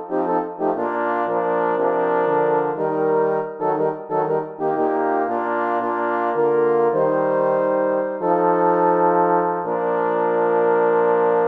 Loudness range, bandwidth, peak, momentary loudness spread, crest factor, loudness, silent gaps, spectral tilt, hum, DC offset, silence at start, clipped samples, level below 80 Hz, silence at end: 3 LU; 4.2 kHz; -4 dBFS; 5 LU; 14 dB; -20 LUFS; none; -9.5 dB/octave; none; under 0.1%; 0 s; under 0.1%; -72 dBFS; 0 s